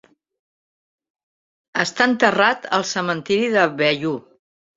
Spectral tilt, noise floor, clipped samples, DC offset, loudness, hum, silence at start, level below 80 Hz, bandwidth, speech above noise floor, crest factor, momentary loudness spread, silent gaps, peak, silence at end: -4 dB/octave; under -90 dBFS; under 0.1%; under 0.1%; -19 LUFS; none; 1.75 s; -66 dBFS; 7.8 kHz; over 71 dB; 20 dB; 9 LU; none; 0 dBFS; 0.55 s